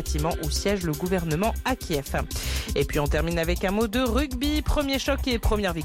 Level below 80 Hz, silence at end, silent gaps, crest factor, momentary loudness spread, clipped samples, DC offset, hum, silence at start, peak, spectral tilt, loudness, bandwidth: -30 dBFS; 0 s; none; 12 dB; 4 LU; under 0.1%; under 0.1%; none; 0 s; -12 dBFS; -5 dB/octave; -26 LUFS; 17 kHz